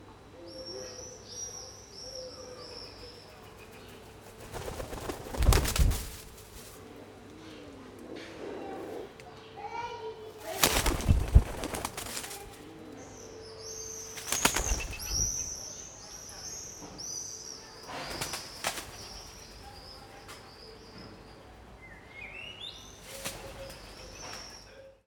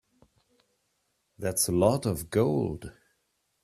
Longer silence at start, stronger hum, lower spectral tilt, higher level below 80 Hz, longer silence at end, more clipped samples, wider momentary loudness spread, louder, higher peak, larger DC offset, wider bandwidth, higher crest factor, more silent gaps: second, 0 s vs 1.4 s; neither; second, -3 dB/octave vs -5 dB/octave; first, -40 dBFS vs -56 dBFS; second, 0.1 s vs 0.7 s; neither; first, 22 LU vs 14 LU; second, -34 LUFS vs -27 LUFS; first, -4 dBFS vs -8 dBFS; neither; first, over 20 kHz vs 15.5 kHz; first, 30 dB vs 22 dB; neither